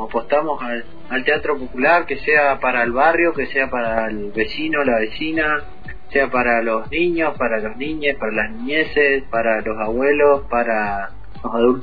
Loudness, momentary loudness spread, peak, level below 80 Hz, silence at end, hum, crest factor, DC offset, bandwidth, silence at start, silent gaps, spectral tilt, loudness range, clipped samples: -19 LUFS; 9 LU; -2 dBFS; -42 dBFS; 0 s; none; 16 dB; 4%; 5 kHz; 0 s; none; -8 dB/octave; 3 LU; under 0.1%